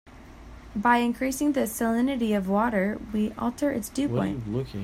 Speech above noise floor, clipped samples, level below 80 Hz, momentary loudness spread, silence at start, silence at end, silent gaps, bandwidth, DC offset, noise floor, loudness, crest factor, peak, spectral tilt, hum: 20 dB; under 0.1%; -48 dBFS; 6 LU; 0.05 s; 0 s; none; 16 kHz; under 0.1%; -45 dBFS; -26 LUFS; 18 dB; -8 dBFS; -5.5 dB/octave; none